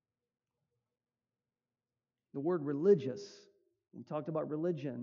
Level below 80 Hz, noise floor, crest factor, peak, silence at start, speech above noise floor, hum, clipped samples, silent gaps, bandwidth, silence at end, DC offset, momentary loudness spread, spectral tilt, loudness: under -90 dBFS; under -90 dBFS; 22 dB; -16 dBFS; 2.35 s; over 56 dB; none; under 0.1%; none; 7.2 kHz; 0 s; under 0.1%; 18 LU; -8 dB/octave; -35 LUFS